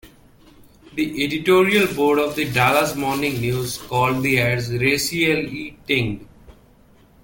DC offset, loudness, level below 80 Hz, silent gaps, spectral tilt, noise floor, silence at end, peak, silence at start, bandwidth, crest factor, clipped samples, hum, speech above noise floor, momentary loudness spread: under 0.1%; -19 LUFS; -48 dBFS; none; -4.5 dB/octave; -52 dBFS; 0.7 s; -2 dBFS; 0.05 s; 17 kHz; 18 dB; under 0.1%; none; 32 dB; 9 LU